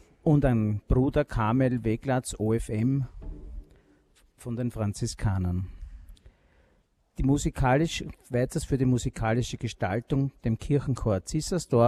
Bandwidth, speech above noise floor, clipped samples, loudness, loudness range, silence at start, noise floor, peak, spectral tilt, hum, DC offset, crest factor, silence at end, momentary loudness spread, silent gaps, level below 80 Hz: 13.5 kHz; 41 dB; under 0.1%; -28 LUFS; 7 LU; 0.25 s; -67 dBFS; -10 dBFS; -6.5 dB/octave; none; under 0.1%; 16 dB; 0 s; 13 LU; none; -40 dBFS